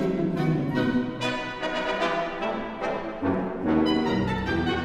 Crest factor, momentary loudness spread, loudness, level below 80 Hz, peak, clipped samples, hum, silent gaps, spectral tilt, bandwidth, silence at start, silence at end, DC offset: 14 dB; 6 LU; -26 LUFS; -46 dBFS; -12 dBFS; under 0.1%; none; none; -6.5 dB/octave; 12 kHz; 0 s; 0 s; 0.1%